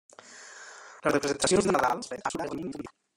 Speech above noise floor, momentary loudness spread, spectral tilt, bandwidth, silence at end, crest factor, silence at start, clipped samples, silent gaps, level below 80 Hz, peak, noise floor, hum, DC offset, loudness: 21 dB; 22 LU; -3.5 dB/octave; 16.5 kHz; 0.3 s; 20 dB; 0.25 s; under 0.1%; none; -58 dBFS; -10 dBFS; -49 dBFS; none; under 0.1%; -28 LUFS